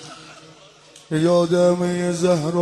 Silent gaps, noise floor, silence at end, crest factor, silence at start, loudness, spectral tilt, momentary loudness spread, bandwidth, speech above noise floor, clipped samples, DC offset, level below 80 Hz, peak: none; -47 dBFS; 0 s; 14 dB; 0 s; -19 LUFS; -6.5 dB/octave; 14 LU; 12 kHz; 29 dB; under 0.1%; under 0.1%; -60 dBFS; -6 dBFS